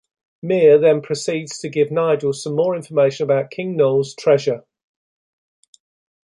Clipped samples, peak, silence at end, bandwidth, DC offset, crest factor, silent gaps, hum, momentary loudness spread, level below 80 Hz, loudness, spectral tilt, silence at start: under 0.1%; -2 dBFS; 1.65 s; 11.5 kHz; under 0.1%; 16 dB; none; none; 11 LU; -68 dBFS; -18 LUFS; -5.5 dB/octave; 0.45 s